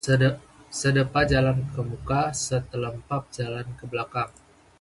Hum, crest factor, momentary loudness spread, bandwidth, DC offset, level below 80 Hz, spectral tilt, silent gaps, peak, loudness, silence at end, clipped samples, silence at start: none; 18 dB; 11 LU; 11.5 kHz; under 0.1%; -44 dBFS; -5.5 dB/octave; none; -8 dBFS; -26 LUFS; 0.5 s; under 0.1%; 0.05 s